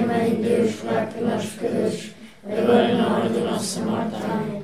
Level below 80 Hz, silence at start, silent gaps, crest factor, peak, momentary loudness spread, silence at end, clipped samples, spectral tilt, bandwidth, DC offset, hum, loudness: -62 dBFS; 0 s; none; 18 dB; -4 dBFS; 8 LU; 0 s; under 0.1%; -5.5 dB/octave; 15.5 kHz; 0.3%; none; -23 LUFS